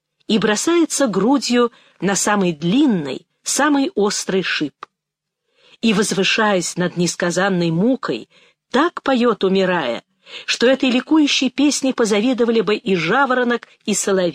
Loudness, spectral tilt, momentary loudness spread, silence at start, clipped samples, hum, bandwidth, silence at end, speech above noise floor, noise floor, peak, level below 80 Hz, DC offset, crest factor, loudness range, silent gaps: -17 LUFS; -4 dB/octave; 7 LU; 0.3 s; under 0.1%; none; 15.5 kHz; 0 s; 63 dB; -80 dBFS; -4 dBFS; -62 dBFS; under 0.1%; 12 dB; 3 LU; none